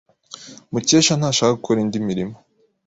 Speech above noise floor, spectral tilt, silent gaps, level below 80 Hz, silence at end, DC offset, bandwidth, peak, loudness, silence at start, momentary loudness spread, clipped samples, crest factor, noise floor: 23 dB; -4 dB/octave; none; -56 dBFS; 0.5 s; under 0.1%; 8 kHz; -2 dBFS; -18 LUFS; 0.3 s; 22 LU; under 0.1%; 18 dB; -41 dBFS